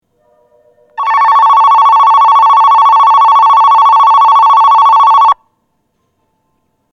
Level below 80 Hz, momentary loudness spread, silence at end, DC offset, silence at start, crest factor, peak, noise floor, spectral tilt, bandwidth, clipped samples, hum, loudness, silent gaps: -56 dBFS; 3 LU; 1.6 s; under 0.1%; 1 s; 6 dB; -2 dBFS; -62 dBFS; 0 dB/octave; 7.2 kHz; under 0.1%; none; -5 LUFS; none